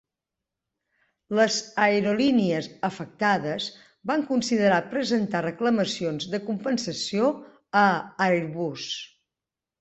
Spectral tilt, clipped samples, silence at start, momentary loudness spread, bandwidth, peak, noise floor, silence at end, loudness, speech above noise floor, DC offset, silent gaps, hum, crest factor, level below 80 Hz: -4.5 dB/octave; under 0.1%; 1.3 s; 9 LU; 8.2 kHz; -6 dBFS; -89 dBFS; 0.75 s; -25 LUFS; 65 dB; under 0.1%; none; none; 18 dB; -66 dBFS